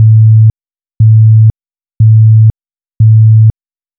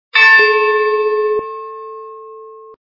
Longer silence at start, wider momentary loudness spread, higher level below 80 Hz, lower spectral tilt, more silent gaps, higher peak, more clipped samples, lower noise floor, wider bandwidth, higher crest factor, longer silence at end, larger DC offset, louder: second, 0 s vs 0.15 s; second, 6 LU vs 24 LU; first, -32 dBFS vs -64 dBFS; first, -22 dB/octave vs -1.5 dB/octave; neither; about the same, 0 dBFS vs 0 dBFS; first, 0.3% vs under 0.1%; first, under -90 dBFS vs -35 dBFS; second, 0.5 kHz vs 6 kHz; second, 6 dB vs 14 dB; first, 0.5 s vs 0.15 s; neither; first, -7 LUFS vs -11 LUFS